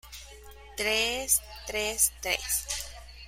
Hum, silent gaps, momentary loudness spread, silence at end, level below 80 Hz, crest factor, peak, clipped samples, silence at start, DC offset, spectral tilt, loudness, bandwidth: none; none; 18 LU; 0 s; -48 dBFS; 24 dB; -8 dBFS; under 0.1%; 0.05 s; under 0.1%; 0 dB/octave; -27 LUFS; 16 kHz